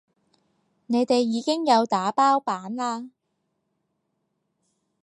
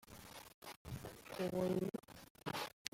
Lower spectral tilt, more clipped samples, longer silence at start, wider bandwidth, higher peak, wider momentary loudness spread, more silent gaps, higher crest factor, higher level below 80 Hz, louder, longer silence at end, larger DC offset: about the same, -4.5 dB/octave vs -5 dB/octave; neither; first, 0.9 s vs 0.05 s; second, 11.5 kHz vs 16.5 kHz; first, -8 dBFS vs -18 dBFS; second, 9 LU vs 16 LU; second, none vs 0.54-0.62 s, 0.76-0.85 s, 2.30-2.35 s, 2.73-2.85 s; second, 18 dB vs 26 dB; second, -78 dBFS vs -68 dBFS; first, -23 LUFS vs -44 LUFS; first, 1.95 s vs 0.05 s; neither